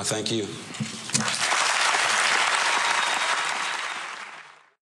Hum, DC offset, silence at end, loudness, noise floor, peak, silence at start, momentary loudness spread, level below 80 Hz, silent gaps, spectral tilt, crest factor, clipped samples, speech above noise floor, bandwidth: none; under 0.1%; 0.3 s; -23 LUFS; -46 dBFS; -6 dBFS; 0 s; 13 LU; -78 dBFS; none; -1 dB/octave; 18 dB; under 0.1%; 19 dB; 14 kHz